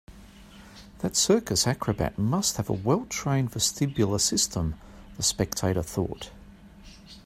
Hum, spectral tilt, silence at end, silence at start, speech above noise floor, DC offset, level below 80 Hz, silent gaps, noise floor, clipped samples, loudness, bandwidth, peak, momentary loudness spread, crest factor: none; -4 dB/octave; 0.05 s; 0.1 s; 22 dB; under 0.1%; -48 dBFS; none; -49 dBFS; under 0.1%; -26 LUFS; 16 kHz; -8 dBFS; 11 LU; 20 dB